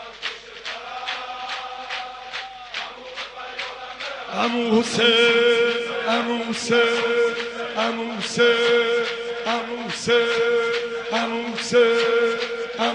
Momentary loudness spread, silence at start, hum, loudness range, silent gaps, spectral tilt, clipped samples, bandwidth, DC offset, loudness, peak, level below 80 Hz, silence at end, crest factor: 15 LU; 0 s; none; 11 LU; none; -3 dB/octave; under 0.1%; 10.5 kHz; under 0.1%; -22 LUFS; -6 dBFS; -62 dBFS; 0 s; 16 dB